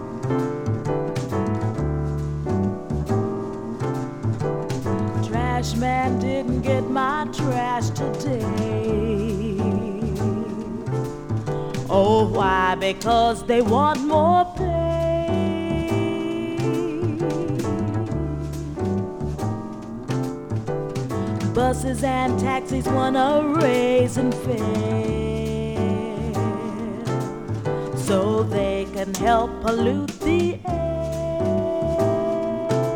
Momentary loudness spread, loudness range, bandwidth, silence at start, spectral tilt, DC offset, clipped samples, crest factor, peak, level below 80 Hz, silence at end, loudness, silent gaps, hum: 8 LU; 5 LU; 19 kHz; 0 s; -6.5 dB/octave; under 0.1%; under 0.1%; 18 dB; -4 dBFS; -38 dBFS; 0 s; -23 LUFS; none; none